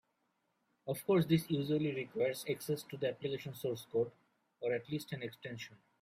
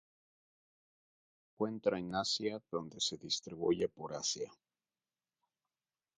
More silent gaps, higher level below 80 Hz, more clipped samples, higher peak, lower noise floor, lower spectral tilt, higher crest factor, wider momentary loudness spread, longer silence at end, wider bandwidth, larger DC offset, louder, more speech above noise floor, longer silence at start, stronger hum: neither; about the same, -74 dBFS vs -72 dBFS; neither; about the same, -18 dBFS vs -18 dBFS; second, -81 dBFS vs under -90 dBFS; first, -6 dB/octave vs -3.5 dB/octave; about the same, 20 dB vs 22 dB; first, 12 LU vs 7 LU; second, 0.25 s vs 1.65 s; first, 16 kHz vs 9.4 kHz; neither; about the same, -37 LUFS vs -37 LUFS; second, 44 dB vs over 52 dB; second, 0.85 s vs 1.6 s; neither